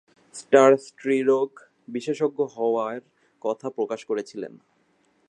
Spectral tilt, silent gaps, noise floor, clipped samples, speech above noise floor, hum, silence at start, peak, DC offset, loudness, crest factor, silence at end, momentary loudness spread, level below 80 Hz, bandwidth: -5 dB/octave; none; -66 dBFS; under 0.1%; 43 dB; none; 0.35 s; -4 dBFS; under 0.1%; -24 LUFS; 22 dB; 0.8 s; 20 LU; -82 dBFS; 9.8 kHz